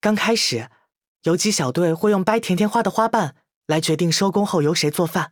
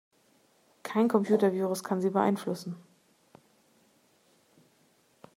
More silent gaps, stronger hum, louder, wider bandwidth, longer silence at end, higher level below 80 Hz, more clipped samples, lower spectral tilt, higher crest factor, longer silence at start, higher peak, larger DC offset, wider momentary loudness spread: first, 1.07-1.20 s, 3.54-3.62 s vs none; neither; first, -20 LUFS vs -28 LUFS; first, over 20 kHz vs 16 kHz; second, 0.05 s vs 2.55 s; first, -62 dBFS vs -82 dBFS; neither; second, -4.5 dB/octave vs -6.5 dB/octave; about the same, 18 dB vs 22 dB; second, 0.05 s vs 0.85 s; first, -2 dBFS vs -10 dBFS; neither; second, 7 LU vs 16 LU